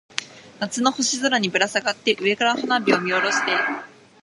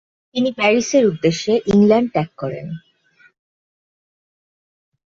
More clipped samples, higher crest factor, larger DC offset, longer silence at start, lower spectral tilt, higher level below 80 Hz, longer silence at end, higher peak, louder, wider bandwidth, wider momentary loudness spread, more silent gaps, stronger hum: neither; first, 22 dB vs 16 dB; neither; second, 0.15 s vs 0.35 s; second, -2.5 dB/octave vs -5.5 dB/octave; second, -72 dBFS vs -56 dBFS; second, 0.35 s vs 2.3 s; about the same, 0 dBFS vs -2 dBFS; second, -21 LUFS vs -17 LUFS; first, 11.5 kHz vs 7.6 kHz; second, 10 LU vs 15 LU; neither; neither